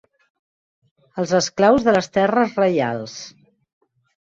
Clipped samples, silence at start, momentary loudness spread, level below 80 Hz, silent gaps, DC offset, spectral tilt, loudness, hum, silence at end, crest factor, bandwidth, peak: under 0.1%; 1.15 s; 19 LU; -56 dBFS; none; under 0.1%; -5 dB/octave; -18 LUFS; none; 0.95 s; 18 dB; 7.8 kHz; -4 dBFS